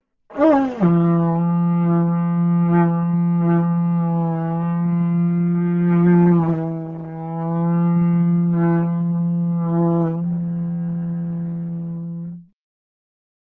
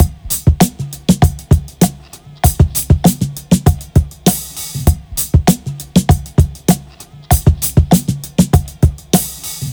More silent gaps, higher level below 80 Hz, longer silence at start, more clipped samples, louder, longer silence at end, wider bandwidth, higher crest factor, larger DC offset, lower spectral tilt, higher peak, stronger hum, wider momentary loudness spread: neither; second, -56 dBFS vs -20 dBFS; first, 0.3 s vs 0 s; neither; second, -19 LUFS vs -14 LUFS; first, 1 s vs 0 s; second, 3.2 kHz vs over 20 kHz; about the same, 16 dB vs 14 dB; neither; first, -12 dB/octave vs -5.5 dB/octave; second, -4 dBFS vs 0 dBFS; neither; first, 11 LU vs 6 LU